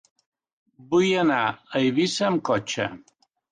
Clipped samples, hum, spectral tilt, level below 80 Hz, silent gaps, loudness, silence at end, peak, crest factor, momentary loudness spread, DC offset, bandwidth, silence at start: under 0.1%; none; -4.5 dB/octave; -66 dBFS; none; -23 LUFS; 0.55 s; -10 dBFS; 16 dB; 7 LU; under 0.1%; 9.6 kHz; 0.8 s